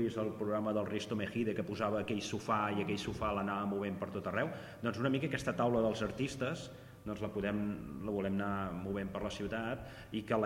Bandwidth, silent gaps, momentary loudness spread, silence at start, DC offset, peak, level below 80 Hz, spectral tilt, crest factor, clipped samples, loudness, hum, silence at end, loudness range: 16 kHz; none; 6 LU; 0 s; under 0.1%; -18 dBFS; -58 dBFS; -6 dB/octave; 18 dB; under 0.1%; -37 LUFS; none; 0 s; 3 LU